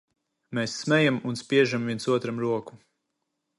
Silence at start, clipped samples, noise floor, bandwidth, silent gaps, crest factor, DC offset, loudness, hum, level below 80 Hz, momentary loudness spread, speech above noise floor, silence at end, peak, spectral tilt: 0.5 s; under 0.1%; -80 dBFS; 11.5 kHz; none; 20 dB; under 0.1%; -26 LUFS; none; -70 dBFS; 9 LU; 55 dB; 0.8 s; -8 dBFS; -5.5 dB/octave